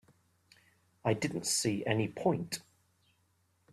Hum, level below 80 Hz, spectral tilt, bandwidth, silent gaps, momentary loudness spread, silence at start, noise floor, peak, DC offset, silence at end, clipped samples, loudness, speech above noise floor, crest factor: none; -70 dBFS; -4 dB/octave; 15.5 kHz; none; 7 LU; 1.05 s; -74 dBFS; -14 dBFS; under 0.1%; 1.1 s; under 0.1%; -33 LUFS; 41 dB; 22 dB